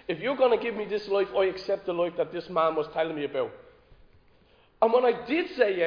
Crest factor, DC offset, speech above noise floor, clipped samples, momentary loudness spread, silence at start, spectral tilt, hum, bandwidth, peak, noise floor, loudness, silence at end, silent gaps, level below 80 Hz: 20 dB; under 0.1%; 34 dB; under 0.1%; 7 LU; 0.1 s; -6.5 dB/octave; none; 5.2 kHz; -8 dBFS; -60 dBFS; -27 LUFS; 0 s; none; -64 dBFS